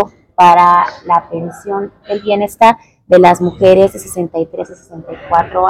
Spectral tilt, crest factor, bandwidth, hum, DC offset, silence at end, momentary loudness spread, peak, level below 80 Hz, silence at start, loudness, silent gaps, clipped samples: -5.5 dB/octave; 12 dB; 15.5 kHz; none; under 0.1%; 0 s; 15 LU; 0 dBFS; -46 dBFS; 0 s; -11 LUFS; none; 2%